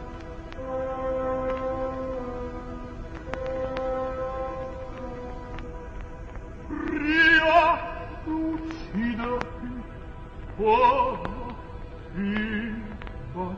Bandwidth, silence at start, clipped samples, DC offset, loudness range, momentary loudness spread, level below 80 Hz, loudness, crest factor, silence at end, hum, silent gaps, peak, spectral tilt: 8 kHz; 0 s; under 0.1%; under 0.1%; 10 LU; 20 LU; -40 dBFS; -26 LUFS; 20 dB; 0 s; none; none; -6 dBFS; -6.5 dB/octave